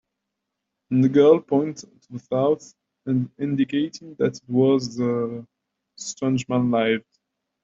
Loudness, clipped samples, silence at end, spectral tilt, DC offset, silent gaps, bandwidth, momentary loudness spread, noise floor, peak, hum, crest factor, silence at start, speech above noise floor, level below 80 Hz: -22 LUFS; under 0.1%; 0.65 s; -6.5 dB/octave; under 0.1%; none; 7.8 kHz; 17 LU; -81 dBFS; -4 dBFS; none; 18 dB; 0.9 s; 60 dB; -66 dBFS